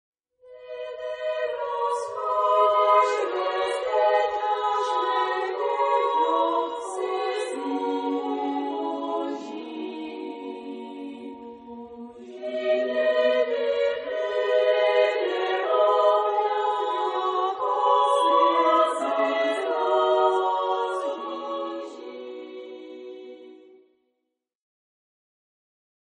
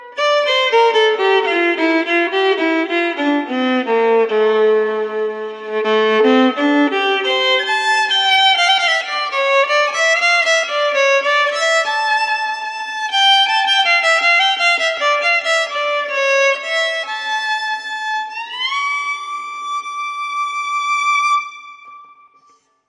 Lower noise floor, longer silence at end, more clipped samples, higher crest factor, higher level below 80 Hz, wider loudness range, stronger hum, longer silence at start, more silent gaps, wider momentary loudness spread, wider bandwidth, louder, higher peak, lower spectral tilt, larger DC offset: first, -77 dBFS vs -55 dBFS; first, 2.5 s vs 0.85 s; neither; about the same, 18 dB vs 14 dB; first, -74 dBFS vs -82 dBFS; first, 13 LU vs 7 LU; neither; first, 0.45 s vs 0 s; neither; first, 18 LU vs 10 LU; second, 10 kHz vs 11.5 kHz; second, -24 LUFS vs -15 LUFS; second, -8 dBFS vs -2 dBFS; first, -2.5 dB/octave vs -1 dB/octave; neither